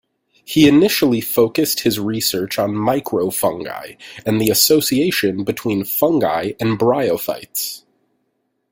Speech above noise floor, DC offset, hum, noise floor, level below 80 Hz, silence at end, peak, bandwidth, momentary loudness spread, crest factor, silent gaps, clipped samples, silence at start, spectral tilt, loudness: 52 dB; under 0.1%; none; -69 dBFS; -54 dBFS; 0.95 s; 0 dBFS; 17 kHz; 11 LU; 18 dB; none; under 0.1%; 0.5 s; -4 dB/octave; -17 LUFS